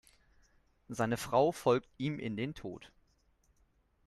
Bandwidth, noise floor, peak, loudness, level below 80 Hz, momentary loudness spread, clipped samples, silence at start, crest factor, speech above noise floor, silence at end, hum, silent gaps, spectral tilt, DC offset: 13.5 kHz; -72 dBFS; -16 dBFS; -33 LUFS; -66 dBFS; 17 LU; under 0.1%; 0.9 s; 20 dB; 38 dB; 1.2 s; none; none; -6 dB/octave; under 0.1%